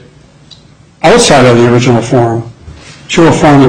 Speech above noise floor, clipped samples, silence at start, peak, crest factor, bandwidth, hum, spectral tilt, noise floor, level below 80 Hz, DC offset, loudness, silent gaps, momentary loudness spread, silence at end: 33 dB; 0.3%; 1.05 s; 0 dBFS; 8 dB; 11.5 kHz; none; -5.5 dB/octave; -38 dBFS; -34 dBFS; under 0.1%; -7 LUFS; none; 9 LU; 0 s